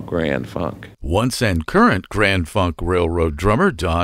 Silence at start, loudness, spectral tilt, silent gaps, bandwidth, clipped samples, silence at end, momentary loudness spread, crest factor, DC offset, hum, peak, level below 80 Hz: 0 s; -18 LUFS; -6 dB/octave; none; 16 kHz; under 0.1%; 0 s; 9 LU; 16 dB; under 0.1%; none; -2 dBFS; -32 dBFS